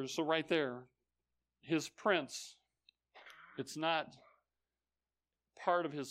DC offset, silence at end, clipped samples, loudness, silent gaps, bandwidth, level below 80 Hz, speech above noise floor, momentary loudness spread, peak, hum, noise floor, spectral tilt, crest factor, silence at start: under 0.1%; 0 s; under 0.1%; -37 LUFS; none; 15.5 kHz; -86 dBFS; over 53 dB; 17 LU; -18 dBFS; none; under -90 dBFS; -4 dB/octave; 22 dB; 0 s